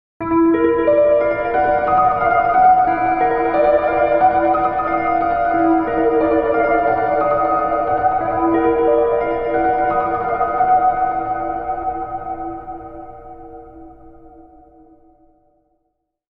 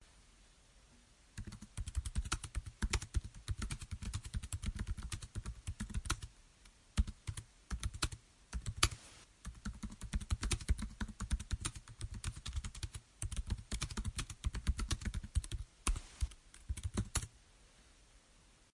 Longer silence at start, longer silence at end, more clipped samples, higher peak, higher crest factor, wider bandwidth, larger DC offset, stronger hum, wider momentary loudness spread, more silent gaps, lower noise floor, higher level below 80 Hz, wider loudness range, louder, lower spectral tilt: first, 0.2 s vs 0 s; first, 1.9 s vs 0.55 s; neither; first, -2 dBFS vs -10 dBFS; second, 14 dB vs 32 dB; second, 4.8 kHz vs 11.5 kHz; neither; neither; about the same, 12 LU vs 11 LU; neither; first, -71 dBFS vs -66 dBFS; about the same, -42 dBFS vs -44 dBFS; first, 12 LU vs 4 LU; first, -16 LUFS vs -43 LUFS; first, -10 dB/octave vs -3.5 dB/octave